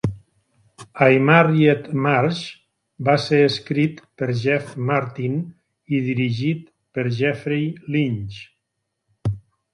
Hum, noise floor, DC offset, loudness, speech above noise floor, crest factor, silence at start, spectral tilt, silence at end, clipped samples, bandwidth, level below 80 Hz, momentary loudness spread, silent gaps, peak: none; -77 dBFS; under 0.1%; -20 LUFS; 58 dB; 20 dB; 0.05 s; -7.5 dB/octave; 0.35 s; under 0.1%; 11 kHz; -52 dBFS; 14 LU; none; 0 dBFS